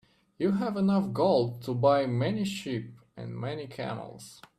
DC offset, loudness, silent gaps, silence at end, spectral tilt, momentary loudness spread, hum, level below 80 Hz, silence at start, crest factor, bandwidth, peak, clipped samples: under 0.1%; -29 LUFS; none; 0.25 s; -7 dB/octave; 16 LU; none; -66 dBFS; 0.4 s; 18 dB; 13.5 kHz; -10 dBFS; under 0.1%